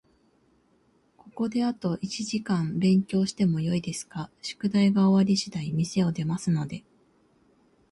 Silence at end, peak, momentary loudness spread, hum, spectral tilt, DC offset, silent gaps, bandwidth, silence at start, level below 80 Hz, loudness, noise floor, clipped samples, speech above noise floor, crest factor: 1.1 s; -12 dBFS; 13 LU; none; -6 dB/octave; under 0.1%; none; 11.5 kHz; 1.25 s; -62 dBFS; -26 LUFS; -65 dBFS; under 0.1%; 40 dB; 16 dB